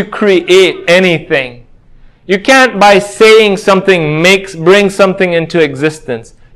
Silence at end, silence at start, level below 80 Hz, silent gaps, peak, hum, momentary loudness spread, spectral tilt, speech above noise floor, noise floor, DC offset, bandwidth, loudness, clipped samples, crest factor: 0.3 s; 0 s; -44 dBFS; none; 0 dBFS; none; 10 LU; -4.5 dB/octave; 30 dB; -39 dBFS; under 0.1%; 16 kHz; -8 LUFS; 3%; 8 dB